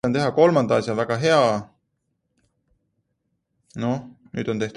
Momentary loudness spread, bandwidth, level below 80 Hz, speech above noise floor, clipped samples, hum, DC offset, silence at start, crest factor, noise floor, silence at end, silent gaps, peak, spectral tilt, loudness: 13 LU; 11 kHz; -58 dBFS; 54 dB; under 0.1%; none; under 0.1%; 0.05 s; 20 dB; -75 dBFS; 0.05 s; none; -4 dBFS; -6 dB/octave; -21 LUFS